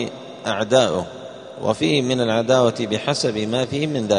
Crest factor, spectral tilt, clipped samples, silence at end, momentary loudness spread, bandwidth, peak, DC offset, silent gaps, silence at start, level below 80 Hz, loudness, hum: 18 dB; -5 dB/octave; under 0.1%; 0 s; 12 LU; 10.5 kHz; -2 dBFS; under 0.1%; none; 0 s; -58 dBFS; -20 LUFS; none